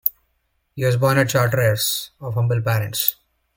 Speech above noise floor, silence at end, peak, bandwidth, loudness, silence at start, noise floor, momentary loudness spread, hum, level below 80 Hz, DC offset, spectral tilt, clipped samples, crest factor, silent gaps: 50 dB; 0.45 s; 0 dBFS; 17 kHz; -20 LUFS; 0.05 s; -69 dBFS; 7 LU; none; -52 dBFS; under 0.1%; -4.5 dB/octave; under 0.1%; 20 dB; none